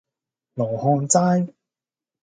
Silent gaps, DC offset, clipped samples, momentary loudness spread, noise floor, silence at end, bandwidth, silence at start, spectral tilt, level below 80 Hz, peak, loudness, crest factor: none; under 0.1%; under 0.1%; 13 LU; -90 dBFS; 0.75 s; 9.4 kHz; 0.55 s; -5.5 dB/octave; -66 dBFS; -2 dBFS; -20 LUFS; 20 dB